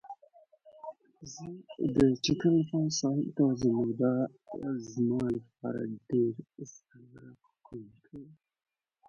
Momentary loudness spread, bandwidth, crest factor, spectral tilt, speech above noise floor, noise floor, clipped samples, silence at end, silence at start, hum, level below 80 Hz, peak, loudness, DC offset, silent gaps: 22 LU; 8.4 kHz; 20 dB; -6 dB/octave; 31 dB; -62 dBFS; under 0.1%; 0.75 s; 0.05 s; none; -62 dBFS; -12 dBFS; -30 LUFS; under 0.1%; none